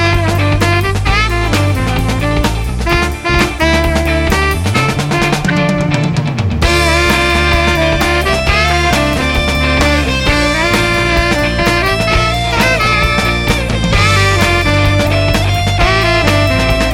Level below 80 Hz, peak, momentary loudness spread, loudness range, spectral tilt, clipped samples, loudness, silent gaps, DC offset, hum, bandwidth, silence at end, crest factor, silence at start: -20 dBFS; 0 dBFS; 4 LU; 2 LU; -5 dB/octave; under 0.1%; -12 LUFS; none; under 0.1%; none; 17 kHz; 0 s; 12 dB; 0 s